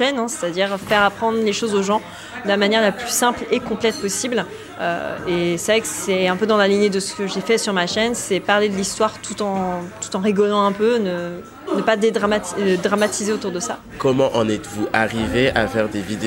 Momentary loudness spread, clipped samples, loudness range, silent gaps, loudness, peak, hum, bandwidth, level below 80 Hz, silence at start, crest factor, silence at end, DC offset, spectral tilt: 8 LU; under 0.1%; 2 LU; none; -19 LUFS; 0 dBFS; none; 16.5 kHz; -48 dBFS; 0 s; 20 dB; 0 s; under 0.1%; -4 dB/octave